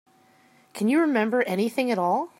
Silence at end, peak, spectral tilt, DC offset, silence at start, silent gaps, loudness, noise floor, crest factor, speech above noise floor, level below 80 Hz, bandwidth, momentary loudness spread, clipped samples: 0.1 s; -10 dBFS; -6 dB/octave; under 0.1%; 0.75 s; none; -24 LUFS; -59 dBFS; 16 dB; 35 dB; -80 dBFS; 16 kHz; 5 LU; under 0.1%